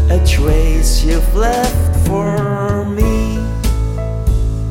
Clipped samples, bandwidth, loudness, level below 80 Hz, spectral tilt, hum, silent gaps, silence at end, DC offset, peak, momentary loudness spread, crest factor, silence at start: under 0.1%; 16.5 kHz; -16 LUFS; -14 dBFS; -6 dB/octave; none; none; 0 s; under 0.1%; 0 dBFS; 5 LU; 12 dB; 0 s